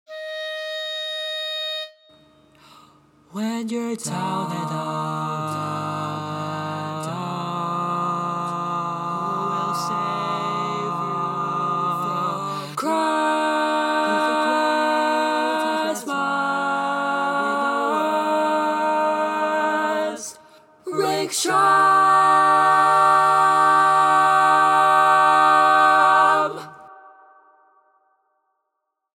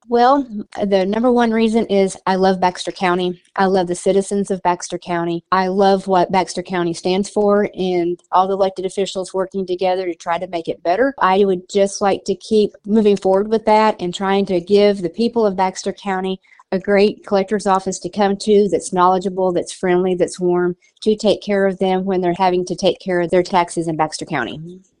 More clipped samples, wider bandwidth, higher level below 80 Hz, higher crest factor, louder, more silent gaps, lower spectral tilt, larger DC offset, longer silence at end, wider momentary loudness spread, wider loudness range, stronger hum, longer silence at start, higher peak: neither; first, 17 kHz vs 11 kHz; second, -74 dBFS vs -52 dBFS; about the same, 18 dB vs 16 dB; second, -20 LUFS vs -17 LUFS; neither; second, -4 dB/octave vs -5.5 dB/octave; neither; first, 2.05 s vs 0.2 s; first, 13 LU vs 8 LU; first, 12 LU vs 3 LU; neither; about the same, 0.1 s vs 0.1 s; second, -4 dBFS vs 0 dBFS